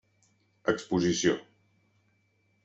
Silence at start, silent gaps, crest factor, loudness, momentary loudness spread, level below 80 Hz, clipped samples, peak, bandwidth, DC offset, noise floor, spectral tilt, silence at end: 0.65 s; none; 22 dB; -29 LUFS; 8 LU; -66 dBFS; under 0.1%; -12 dBFS; 8.2 kHz; under 0.1%; -71 dBFS; -4.5 dB/octave; 1.25 s